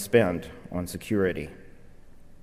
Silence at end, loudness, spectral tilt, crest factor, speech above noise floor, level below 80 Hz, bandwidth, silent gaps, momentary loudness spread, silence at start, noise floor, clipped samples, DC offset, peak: 0 s; -28 LUFS; -6 dB/octave; 20 dB; 20 dB; -50 dBFS; 15.5 kHz; none; 13 LU; 0 s; -46 dBFS; under 0.1%; under 0.1%; -8 dBFS